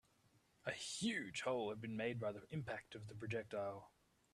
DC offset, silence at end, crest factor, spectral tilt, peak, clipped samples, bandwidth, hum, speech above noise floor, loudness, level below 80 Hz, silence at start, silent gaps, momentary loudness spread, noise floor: under 0.1%; 0.45 s; 18 dB; -4.5 dB/octave; -28 dBFS; under 0.1%; 13.5 kHz; none; 31 dB; -45 LUFS; -78 dBFS; 0.65 s; none; 9 LU; -76 dBFS